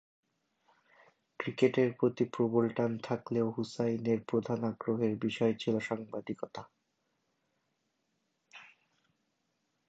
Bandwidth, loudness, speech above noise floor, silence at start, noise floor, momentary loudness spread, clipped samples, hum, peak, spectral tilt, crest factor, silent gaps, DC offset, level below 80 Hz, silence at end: 8 kHz; -33 LUFS; 48 dB; 1.4 s; -80 dBFS; 12 LU; under 0.1%; none; -14 dBFS; -7 dB/octave; 22 dB; none; under 0.1%; -76 dBFS; 1.25 s